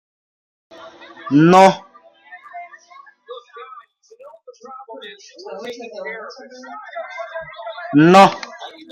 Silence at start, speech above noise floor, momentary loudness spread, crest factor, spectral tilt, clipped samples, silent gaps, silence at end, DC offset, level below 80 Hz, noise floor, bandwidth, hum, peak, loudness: 1.25 s; 31 dB; 28 LU; 20 dB; -6 dB/octave; under 0.1%; none; 0.25 s; under 0.1%; -62 dBFS; -46 dBFS; 14.5 kHz; none; 0 dBFS; -12 LUFS